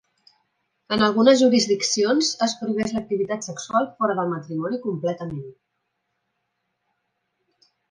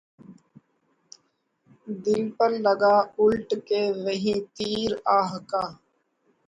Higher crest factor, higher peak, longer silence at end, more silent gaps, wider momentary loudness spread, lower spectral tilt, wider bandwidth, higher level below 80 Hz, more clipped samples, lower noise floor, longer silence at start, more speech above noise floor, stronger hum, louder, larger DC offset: about the same, 20 dB vs 18 dB; first, -4 dBFS vs -8 dBFS; first, 2.4 s vs 0.75 s; neither; first, 12 LU vs 9 LU; second, -4 dB/octave vs -5.5 dB/octave; about the same, 10.5 kHz vs 9.6 kHz; about the same, -62 dBFS vs -62 dBFS; neither; first, -76 dBFS vs -71 dBFS; first, 0.9 s vs 0.3 s; first, 55 dB vs 47 dB; neither; about the same, -22 LUFS vs -24 LUFS; neither